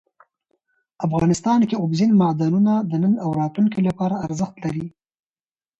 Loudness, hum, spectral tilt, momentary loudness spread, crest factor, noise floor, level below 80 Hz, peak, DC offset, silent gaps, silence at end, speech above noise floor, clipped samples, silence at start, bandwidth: -20 LUFS; none; -7.5 dB/octave; 10 LU; 14 dB; under -90 dBFS; -54 dBFS; -6 dBFS; under 0.1%; none; 0.9 s; over 71 dB; under 0.1%; 1 s; 8.2 kHz